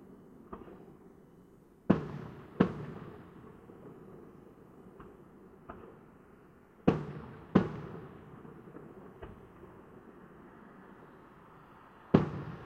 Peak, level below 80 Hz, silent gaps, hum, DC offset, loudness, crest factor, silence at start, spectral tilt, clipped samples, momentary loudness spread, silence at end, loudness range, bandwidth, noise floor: -8 dBFS; -60 dBFS; none; none; under 0.1%; -34 LUFS; 32 dB; 0 s; -9 dB/octave; under 0.1%; 25 LU; 0 s; 17 LU; 6.8 kHz; -59 dBFS